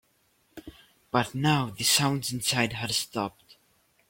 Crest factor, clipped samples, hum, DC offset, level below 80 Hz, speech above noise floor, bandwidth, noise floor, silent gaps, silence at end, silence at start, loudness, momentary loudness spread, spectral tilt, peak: 22 dB; under 0.1%; none; under 0.1%; -60 dBFS; 41 dB; 16.5 kHz; -68 dBFS; none; 0.55 s; 0.55 s; -26 LUFS; 17 LU; -3 dB/octave; -8 dBFS